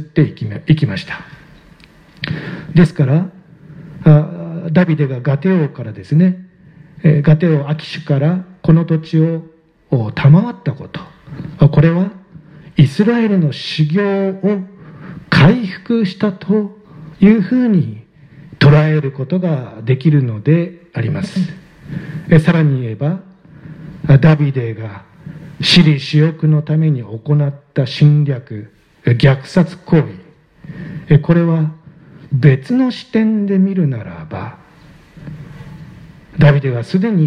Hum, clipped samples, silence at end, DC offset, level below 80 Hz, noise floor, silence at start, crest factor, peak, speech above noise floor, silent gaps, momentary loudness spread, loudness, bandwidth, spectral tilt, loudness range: none; under 0.1%; 0 s; under 0.1%; -42 dBFS; -44 dBFS; 0 s; 14 dB; 0 dBFS; 31 dB; none; 19 LU; -14 LUFS; 9.6 kHz; -8 dB/octave; 3 LU